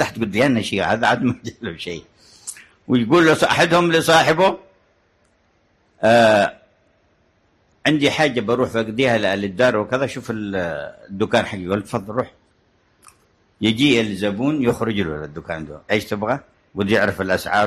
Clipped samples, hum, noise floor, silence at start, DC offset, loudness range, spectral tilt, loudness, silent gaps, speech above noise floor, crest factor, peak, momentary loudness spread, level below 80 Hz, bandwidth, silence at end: under 0.1%; none; -61 dBFS; 0 s; under 0.1%; 5 LU; -5 dB/octave; -19 LUFS; none; 43 dB; 16 dB; -4 dBFS; 16 LU; -50 dBFS; 13 kHz; 0 s